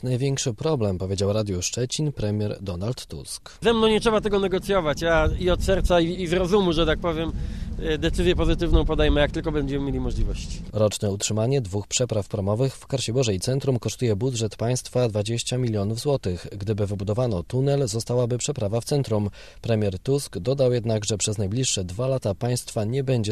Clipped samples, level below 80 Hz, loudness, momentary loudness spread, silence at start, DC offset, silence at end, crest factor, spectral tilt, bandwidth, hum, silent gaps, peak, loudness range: under 0.1%; -34 dBFS; -24 LUFS; 7 LU; 0.05 s; 0.3%; 0 s; 18 dB; -5 dB/octave; 13.5 kHz; none; none; -6 dBFS; 3 LU